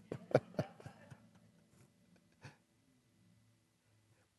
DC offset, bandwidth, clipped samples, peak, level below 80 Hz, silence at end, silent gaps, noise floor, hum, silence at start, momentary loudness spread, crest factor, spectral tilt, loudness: under 0.1%; 12 kHz; under 0.1%; -14 dBFS; -76 dBFS; 1.9 s; none; -74 dBFS; none; 0.1 s; 24 LU; 32 dB; -7.5 dB/octave; -39 LUFS